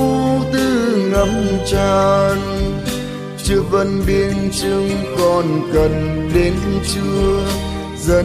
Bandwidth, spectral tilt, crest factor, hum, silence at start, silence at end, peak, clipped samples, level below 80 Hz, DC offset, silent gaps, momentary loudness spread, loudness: 15.5 kHz; -6 dB/octave; 14 dB; none; 0 s; 0 s; -2 dBFS; under 0.1%; -28 dBFS; under 0.1%; none; 6 LU; -17 LUFS